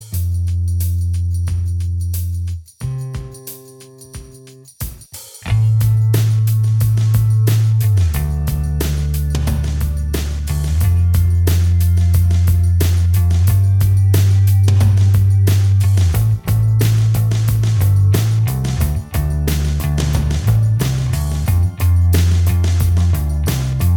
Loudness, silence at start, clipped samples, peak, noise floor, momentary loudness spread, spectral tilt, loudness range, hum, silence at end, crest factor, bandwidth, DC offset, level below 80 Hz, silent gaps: -16 LUFS; 0 s; under 0.1%; 0 dBFS; -40 dBFS; 11 LU; -6.5 dB/octave; 8 LU; none; 0 s; 14 dB; 20 kHz; under 0.1%; -24 dBFS; none